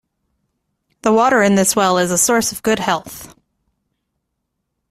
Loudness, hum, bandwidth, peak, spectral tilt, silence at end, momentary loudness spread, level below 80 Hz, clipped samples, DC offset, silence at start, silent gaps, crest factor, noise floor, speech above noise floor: -15 LUFS; none; 16 kHz; 0 dBFS; -3.5 dB/octave; 1.65 s; 10 LU; -54 dBFS; under 0.1%; under 0.1%; 1.05 s; none; 18 dB; -74 dBFS; 59 dB